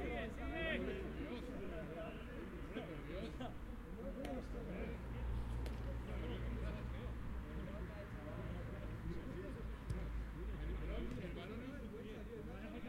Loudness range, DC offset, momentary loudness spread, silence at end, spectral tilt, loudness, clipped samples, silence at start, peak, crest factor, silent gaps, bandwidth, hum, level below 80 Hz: 2 LU; under 0.1%; 5 LU; 0 s; -7 dB/octave; -48 LUFS; under 0.1%; 0 s; -30 dBFS; 16 dB; none; 15.5 kHz; none; -48 dBFS